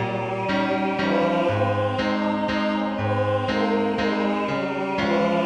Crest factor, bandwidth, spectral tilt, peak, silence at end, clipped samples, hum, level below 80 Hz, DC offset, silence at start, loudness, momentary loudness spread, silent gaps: 14 dB; 9.6 kHz; -7 dB/octave; -8 dBFS; 0 s; under 0.1%; none; -52 dBFS; under 0.1%; 0 s; -23 LUFS; 3 LU; none